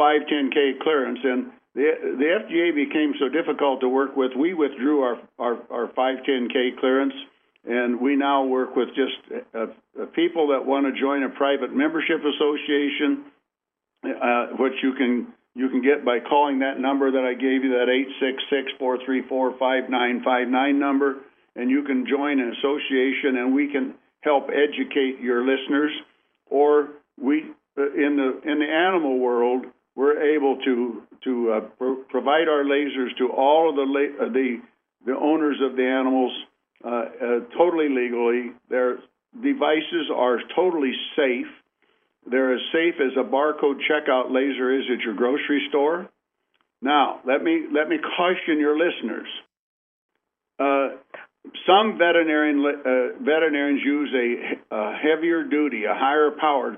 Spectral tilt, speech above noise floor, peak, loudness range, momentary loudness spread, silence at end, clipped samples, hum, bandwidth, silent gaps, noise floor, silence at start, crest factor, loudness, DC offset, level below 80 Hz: -8 dB/octave; 63 dB; -2 dBFS; 2 LU; 8 LU; 0 s; under 0.1%; none; 3.7 kHz; 49.59-50.09 s; -85 dBFS; 0 s; 20 dB; -22 LUFS; under 0.1%; -82 dBFS